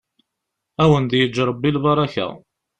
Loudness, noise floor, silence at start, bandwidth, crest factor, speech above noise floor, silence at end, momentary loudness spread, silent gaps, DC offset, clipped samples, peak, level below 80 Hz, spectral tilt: -19 LUFS; -80 dBFS; 0.8 s; 8.8 kHz; 16 dB; 62 dB; 0.4 s; 11 LU; none; under 0.1%; under 0.1%; -4 dBFS; -48 dBFS; -7 dB/octave